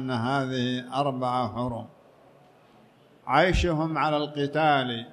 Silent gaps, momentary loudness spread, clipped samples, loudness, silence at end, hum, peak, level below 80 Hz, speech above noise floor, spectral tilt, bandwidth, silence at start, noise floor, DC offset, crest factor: none; 8 LU; under 0.1%; -26 LUFS; 0 s; none; -8 dBFS; -42 dBFS; 31 dB; -6 dB/octave; 11 kHz; 0 s; -56 dBFS; under 0.1%; 20 dB